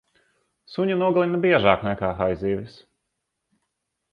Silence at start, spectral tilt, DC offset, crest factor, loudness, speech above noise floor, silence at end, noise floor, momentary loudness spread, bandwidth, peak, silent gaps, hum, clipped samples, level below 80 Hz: 0.7 s; -8.5 dB/octave; under 0.1%; 22 dB; -22 LUFS; 58 dB; 1.45 s; -79 dBFS; 12 LU; 5.4 kHz; -2 dBFS; none; none; under 0.1%; -50 dBFS